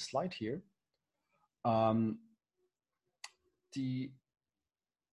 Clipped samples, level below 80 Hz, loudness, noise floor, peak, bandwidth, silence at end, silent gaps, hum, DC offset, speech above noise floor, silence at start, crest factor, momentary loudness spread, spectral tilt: under 0.1%; -74 dBFS; -37 LUFS; under -90 dBFS; -18 dBFS; 11 kHz; 1 s; none; none; under 0.1%; over 55 dB; 0 s; 22 dB; 22 LU; -6.5 dB/octave